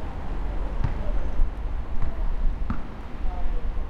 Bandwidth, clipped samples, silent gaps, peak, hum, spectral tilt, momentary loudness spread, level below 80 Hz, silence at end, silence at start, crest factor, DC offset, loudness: 4.4 kHz; under 0.1%; none; -10 dBFS; none; -8 dB/octave; 4 LU; -26 dBFS; 0 s; 0 s; 14 dB; under 0.1%; -33 LUFS